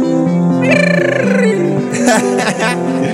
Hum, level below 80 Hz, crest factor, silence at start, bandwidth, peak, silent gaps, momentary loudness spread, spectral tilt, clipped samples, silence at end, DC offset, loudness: none; -56 dBFS; 12 dB; 0 s; 13.5 kHz; 0 dBFS; none; 4 LU; -5.5 dB/octave; under 0.1%; 0 s; under 0.1%; -12 LUFS